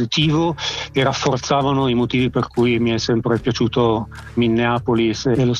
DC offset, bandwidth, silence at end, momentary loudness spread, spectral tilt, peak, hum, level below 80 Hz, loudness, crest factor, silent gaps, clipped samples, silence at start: under 0.1%; 9.8 kHz; 0 s; 4 LU; -5.5 dB/octave; -4 dBFS; none; -42 dBFS; -18 LUFS; 14 dB; none; under 0.1%; 0 s